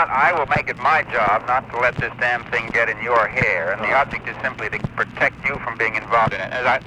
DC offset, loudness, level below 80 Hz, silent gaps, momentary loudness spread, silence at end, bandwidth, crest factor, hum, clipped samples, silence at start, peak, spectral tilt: under 0.1%; -19 LUFS; -46 dBFS; none; 7 LU; 0 s; 11.5 kHz; 16 dB; none; under 0.1%; 0 s; -4 dBFS; -5.5 dB/octave